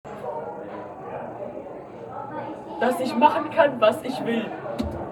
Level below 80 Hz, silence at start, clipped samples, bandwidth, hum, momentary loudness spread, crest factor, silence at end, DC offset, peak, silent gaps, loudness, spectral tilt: -50 dBFS; 0.05 s; under 0.1%; 18 kHz; none; 17 LU; 22 dB; 0 s; under 0.1%; -2 dBFS; none; -25 LUFS; -5.5 dB/octave